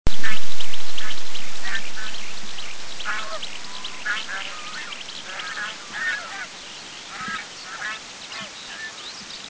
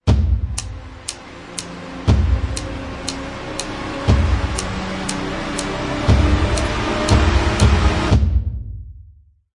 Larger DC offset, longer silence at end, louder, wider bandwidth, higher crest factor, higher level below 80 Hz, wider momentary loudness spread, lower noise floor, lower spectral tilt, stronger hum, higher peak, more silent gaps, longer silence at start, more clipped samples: neither; second, 0 s vs 0.45 s; second, -30 LUFS vs -20 LUFS; second, 8 kHz vs 11 kHz; second, 12 dB vs 18 dB; second, -42 dBFS vs -22 dBFS; second, 7 LU vs 14 LU; second, -38 dBFS vs -47 dBFS; second, -2 dB/octave vs -5.5 dB/octave; neither; about the same, -2 dBFS vs 0 dBFS; neither; about the same, 0.05 s vs 0.05 s; neither